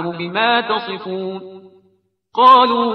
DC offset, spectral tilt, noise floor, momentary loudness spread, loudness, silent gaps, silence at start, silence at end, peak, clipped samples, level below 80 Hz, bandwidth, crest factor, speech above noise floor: under 0.1%; -6 dB/octave; -60 dBFS; 17 LU; -15 LUFS; none; 0 s; 0 s; 0 dBFS; under 0.1%; -68 dBFS; 6 kHz; 16 dB; 45 dB